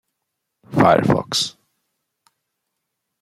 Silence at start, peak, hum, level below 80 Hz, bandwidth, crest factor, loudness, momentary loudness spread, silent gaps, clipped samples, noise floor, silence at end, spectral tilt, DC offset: 0.7 s; 0 dBFS; none; -56 dBFS; 15.5 kHz; 22 dB; -18 LUFS; 11 LU; none; under 0.1%; -78 dBFS; 1.7 s; -5 dB/octave; under 0.1%